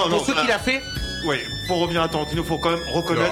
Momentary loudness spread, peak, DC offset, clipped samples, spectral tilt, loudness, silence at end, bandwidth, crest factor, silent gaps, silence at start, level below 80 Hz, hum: 5 LU; -6 dBFS; under 0.1%; under 0.1%; -4.5 dB/octave; -22 LUFS; 0 s; 16.5 kHz; 16 dB; none; 0 s; -38 dBFS; none